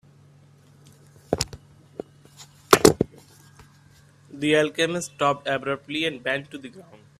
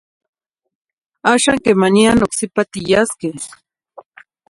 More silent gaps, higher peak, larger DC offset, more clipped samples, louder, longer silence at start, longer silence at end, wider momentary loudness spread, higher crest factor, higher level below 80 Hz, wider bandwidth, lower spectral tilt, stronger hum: neither; about the same, 0 dBFS vs 0 dBFS; neither; neither; second, -23 LUFS vs -15 LUFS; about the same, 1.3 s vs 1.25 s; second, 0.4 s vs 1.05 s; first, 24 LU vs 13 LU; first, 26 dB vs 18 dB; second, -54 dBFS vs -46 dBFS; first, 15.5 kHz vs 11.5 kHz; about the same, -4 dB/octave vs -4 dB/octave; neither